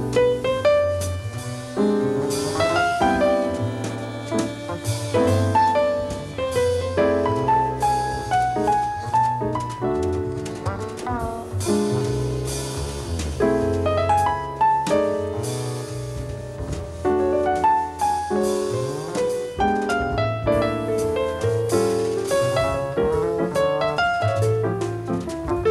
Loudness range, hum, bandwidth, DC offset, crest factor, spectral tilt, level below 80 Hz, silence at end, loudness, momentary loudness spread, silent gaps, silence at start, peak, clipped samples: 3 LU; none; 14 kHz; under 0.1%; 16 dB; -5.5 dB/octave; -40 dBFS; 0 s; -22 LUFS; 9 LU; none; 0 s; -6 dBFS; under 0.1%